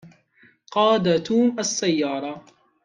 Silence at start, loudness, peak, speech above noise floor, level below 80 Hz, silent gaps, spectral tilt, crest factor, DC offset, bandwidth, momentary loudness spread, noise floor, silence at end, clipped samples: 0.05 s; -21 LUFS; -6 dBFS; 37 dB; -66 dBFS; none; -4.5 dB/octave; 16 dB; under 0.1%; 10 kHz; 12 LU; -58 dBFS; 0.45 s; under 0.1%